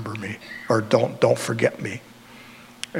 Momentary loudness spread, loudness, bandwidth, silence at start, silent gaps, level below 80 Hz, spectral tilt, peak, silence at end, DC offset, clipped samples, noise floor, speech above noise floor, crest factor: 24 LU; -23 LUFS; 16 kHz; 0 s; none; -66 dBFS; -5.5 dB/octave; -4 dBFS; 0 s; under 0.1%; under 0.1%; -45 dBFS; 23 dB; 22 dB